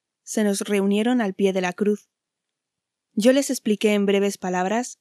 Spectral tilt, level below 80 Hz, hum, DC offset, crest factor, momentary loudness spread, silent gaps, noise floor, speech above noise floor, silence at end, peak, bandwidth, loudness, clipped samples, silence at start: -5 dB/octave; -78 dBFS; none; under 0.1%; 18 dB; 6 LU; none; -84 dBFS; 63 dB; 0.1 s; -4 dBFS; 13 kHz; -22 LUFS; under 0.1%; 0.25 s